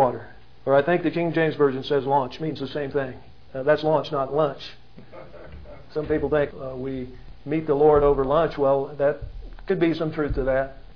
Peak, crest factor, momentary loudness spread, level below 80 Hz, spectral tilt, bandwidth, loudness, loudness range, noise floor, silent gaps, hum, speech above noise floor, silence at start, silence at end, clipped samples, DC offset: -6 dBFS; 18 dB; 19 LU; -42 dBFS; -8.5 dB/octave; 5.4 kHz; -23 LUFS; 6 LU; -43 dBFS; none; none; 20 dB; 0 s; 0.05 s; under 0.1%; 0.7%